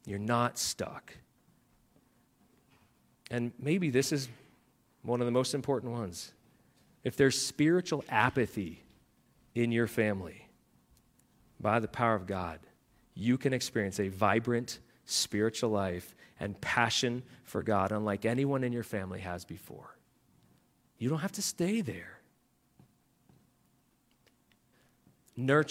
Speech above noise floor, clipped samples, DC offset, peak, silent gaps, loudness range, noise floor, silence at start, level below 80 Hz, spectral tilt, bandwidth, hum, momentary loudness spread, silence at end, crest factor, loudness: 40 dB; under 0.1%; under 0.1%; -10 dBFS; none; 6 LU; -71 dBFS; 0.05 s; -68 dBFS; -4.5 dB/octave; 16.5 kHz; none; 15 LU; 0 s; 24 dB; -32 LUFS